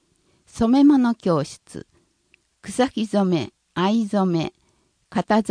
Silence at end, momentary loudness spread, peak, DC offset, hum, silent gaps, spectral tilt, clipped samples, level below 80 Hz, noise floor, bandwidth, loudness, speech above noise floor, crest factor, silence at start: 0 s; 22 LU; -4 dBFS; under 0.1%; none; none; -6.5 dB/octave; under 0.1%; -54 dBFS; -64 dBFS; 10.5 kHz; -21 LUFS; 45 dB; 16 dB; 0.55 s